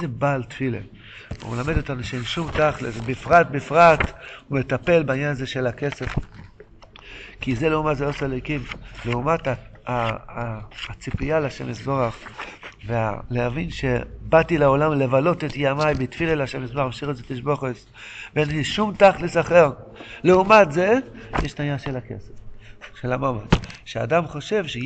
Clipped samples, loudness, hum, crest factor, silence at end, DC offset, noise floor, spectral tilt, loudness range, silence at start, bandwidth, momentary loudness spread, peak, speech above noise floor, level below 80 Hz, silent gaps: under 0.1%; -22 LUFS; none; 20 dB; 0 s; under 0.1%; -46 dBFS; -6.5 dB/octave; 8 LU; 0 s; 8.8 kHz; 17 LU; -2 dBFS; 25 dB; -40 dBFS; none